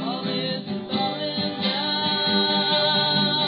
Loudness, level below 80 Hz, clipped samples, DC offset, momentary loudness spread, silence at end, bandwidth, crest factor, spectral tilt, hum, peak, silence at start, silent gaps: -22 LUFS; -66 dBFS; under 0.1%; under 0.1%; 7 LU; 0 s; 5.4 kHz; 16 dB; -2 dB/octave; none; -8 dBFS; 0 s; none